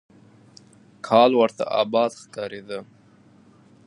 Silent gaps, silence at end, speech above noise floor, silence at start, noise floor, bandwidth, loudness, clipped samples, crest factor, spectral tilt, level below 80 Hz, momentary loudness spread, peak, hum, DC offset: none; 1.05 s; 33 dB; 1.05 s; -54 dBFS; 11 kHz; -21 LUFS; under 0.1%; 22 dB; -5 dB/octave; -72 dBFS; 19 LU; -4 dBFS; none; under 0.1%